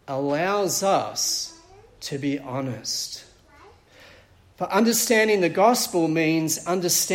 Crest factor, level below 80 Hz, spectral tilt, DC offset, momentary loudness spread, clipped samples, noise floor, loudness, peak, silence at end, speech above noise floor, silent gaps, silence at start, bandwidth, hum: 18 dB; -62 dBFS; -3 dB/octave; under 0.1%; 13 LU; under 0.1%; -53 dBFS; -22 LUFS; -4 dBFS; 0 s; 30 dB; none; 0.1 s; 16.5 kHz; none